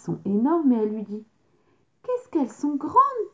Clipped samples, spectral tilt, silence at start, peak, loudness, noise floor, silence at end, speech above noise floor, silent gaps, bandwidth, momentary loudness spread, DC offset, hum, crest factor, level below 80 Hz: under 0.1%; -8.5 dB/octave; 0.05 s; -6 dBFS; -24 LUFS; -65 dBFS; 0.05 s; 43 dB; none; 7.8 kHz; 15 LU; under 0.1%; none; 18 dB; -68 dBFS